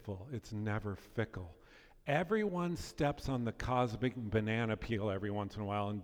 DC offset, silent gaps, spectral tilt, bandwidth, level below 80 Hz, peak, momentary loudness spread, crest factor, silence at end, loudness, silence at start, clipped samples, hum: under 0.1%; none; -7 dB/octave; 15.5 kHz; -54 dBFS; -18 dBFS; 9 LU; 18 dB; 0 s; -37 LUFS; 0 s; under 0.1%; none